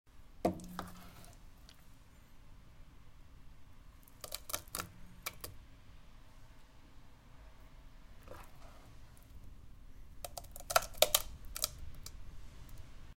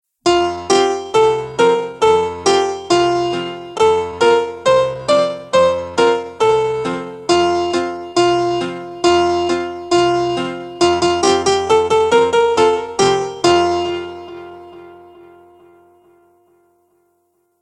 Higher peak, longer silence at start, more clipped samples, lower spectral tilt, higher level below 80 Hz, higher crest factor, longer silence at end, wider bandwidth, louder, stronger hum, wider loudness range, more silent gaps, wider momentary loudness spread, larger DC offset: about the same, -2 dBFS vs 0 dBFS; second, 0.05 s vs 0.25 s; neither; second, -2 dB/octave vs -4 dB/octave; second, -56 dBFS vs -50 dBFS; first, 40 dB vs 16 dB; second, 0 s vs 2.65 s; first, 17 kHz vs 11 kHz; second, -38 LUFS vs -15 LUFS; neither; first, 22 LU vs 4 LU; neither; first, 28 LU vs 8 LU; neither